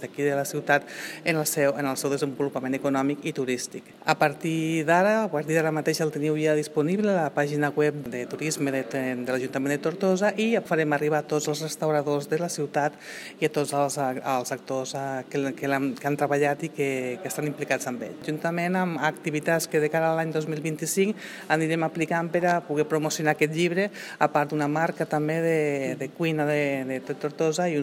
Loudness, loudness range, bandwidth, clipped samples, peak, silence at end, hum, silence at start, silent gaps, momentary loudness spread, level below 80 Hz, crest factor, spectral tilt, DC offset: -26 LUFS; 3 LU; 16.5 kHz; under 0.1%; -6 dBFS; 0 s; none; 0 s; none; 6 LU; -76 dBFS; 20 dB; -5 dB/octave; under 0.1%